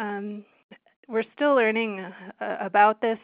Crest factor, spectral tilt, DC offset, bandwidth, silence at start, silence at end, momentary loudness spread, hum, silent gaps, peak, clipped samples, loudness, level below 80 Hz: 20 dB; -9 dB/octave; under 0.1%; 4.9 kHz; 0 s; 0.05 s; 17 LU; none; 0.64-0.69 s, 0.96-1.03 s; -4 dBFS; under 0.1%; -24 LUFS; -80 dBFS